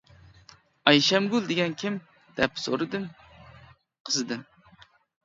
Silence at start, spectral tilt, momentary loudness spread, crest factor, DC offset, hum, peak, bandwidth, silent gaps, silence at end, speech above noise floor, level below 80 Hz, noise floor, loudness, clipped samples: 0.85 s; -3.5 dB/octave; 17 LU; 28 dB; under 0.1%; none; -2 dBFS; 7.8 kHz; 4.00-4.05 s; 0.85 s; 32 dB; -62 dBFS; -57 dBFS; -26 LUFS; under 0.1%